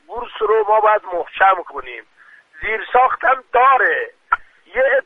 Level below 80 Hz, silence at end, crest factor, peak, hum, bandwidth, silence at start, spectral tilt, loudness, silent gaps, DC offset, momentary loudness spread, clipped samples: -50 dBFS; 0.05 s; 16 dB; 0 dBFS; none; 4 kHz; 0.1 s; -4.5 dB/octave; -16 LUFS; none; under 0.1%; 15 LU; under 0.1%